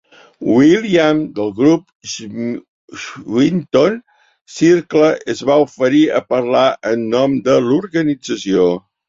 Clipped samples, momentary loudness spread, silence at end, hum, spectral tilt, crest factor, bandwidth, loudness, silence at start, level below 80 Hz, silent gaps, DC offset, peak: under 0.1%; 14 LU; 0.3 s; none; -6 dB/octave; 14 dB; 7.8 kHz; -15 LUFS; 0.4 s; -56 dBFS; 1.95-2.00 s, 2.68-2.88 s, 4.41-4.45 s; under 0.1%; -2 dBFS